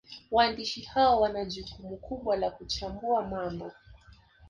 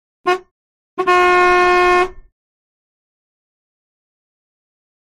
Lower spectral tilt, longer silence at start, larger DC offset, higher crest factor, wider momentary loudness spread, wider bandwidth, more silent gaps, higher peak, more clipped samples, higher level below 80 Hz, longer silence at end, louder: about the same, -4.5 dB/octave vs -3.5 dB/octave; second, 0.1 s vs 0.25 s; neither; about the same, 20 dB vs 16 dB; first, 16 LU vs 11 LU; second, 10 kHz vs 11.5 kHz; second, none vs 0.51-0.97 s; second, -12 dBFS vs -4 dBFS; neither; second, -52 dBFS vs -44 dBFS; second, 0 s vs 2.9 s; second, -29 LUFS vs -14 LUFS